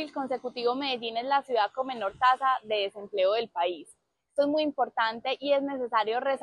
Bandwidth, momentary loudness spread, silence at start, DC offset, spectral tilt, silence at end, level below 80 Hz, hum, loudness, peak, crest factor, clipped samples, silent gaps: 11.5 kHz; 7 LU; 0 s; under 0.1%; -4 dB/octave; 0 s; -74 dBFS; none; -28 LUFS; -10 dBFS; 18 dB; under 0.1%; none